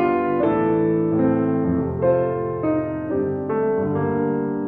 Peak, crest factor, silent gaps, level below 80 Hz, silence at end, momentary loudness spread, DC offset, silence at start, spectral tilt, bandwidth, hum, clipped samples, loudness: -8 dBFS; 12 dB; none; -52 dBFS; 0 s; 4 LU; under 0.1%; 0 s; -12 dB/octave; 3.8 kHz; none; under 0.1%; -21 LUFS